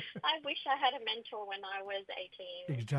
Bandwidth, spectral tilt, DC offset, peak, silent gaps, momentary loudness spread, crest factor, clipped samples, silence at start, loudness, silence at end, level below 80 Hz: 11.5 kHz; -5.5 dB/octave; under 0.1%; -16 dBFS; none; 12 LU; 20 dB; under 0.1%; 0 s; -37 LUFS; 0 s; -78 dBFS